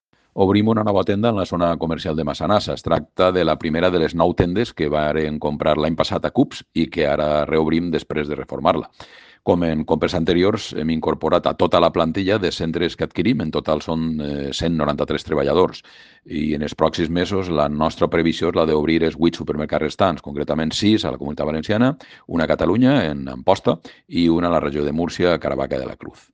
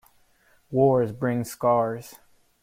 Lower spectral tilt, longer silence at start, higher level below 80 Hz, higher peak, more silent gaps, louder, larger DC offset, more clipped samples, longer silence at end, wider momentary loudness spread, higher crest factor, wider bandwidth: about the same, -6.5 dB/octave vs -7.5 dB/octave; second, 0.35 s vs 0.7 s; first, -44 dBFS vs -60 dBFS; first, 0 dBFS vs -8 dBFS; neither; first, -20 LUFS vs -24 LUFS; neither; neither; second, 0.25 s vs 0.5 s; about the same, 7 LU vs 9 LU; about the same, 20 dB vs 18 dB; second, 9.4 kHz vs 16.5 kHz